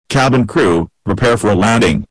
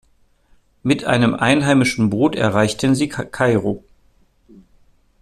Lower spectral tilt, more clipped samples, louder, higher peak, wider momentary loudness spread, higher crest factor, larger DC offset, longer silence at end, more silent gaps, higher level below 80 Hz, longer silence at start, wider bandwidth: about the same, -5.5 dB/octave vs -5.5 dB/octave; neither; first, -13 LUFS vs -17 LUFS; second, -8 dBFS vs -2 dBFS; second, 5 LU vs 8 LU; second, 6 dB vs 16 dB; neither; second, 0.05 s vs 1.45 s; neither; first, -34 dBFS vs -50 dBFS; second, 0.1 s vs 0.85 s; second, 11 kHz vs 13.5 kHz